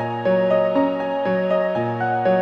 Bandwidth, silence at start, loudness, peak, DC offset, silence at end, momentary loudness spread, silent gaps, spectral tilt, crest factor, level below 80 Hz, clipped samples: 5.4 kHz; 0 s; -20 LUFS; -8 dBFS; under 0.1%; 0 s; 4 LU; none; -8.5 dB/octave; 12 dB; -60 dBFS; under 0.1%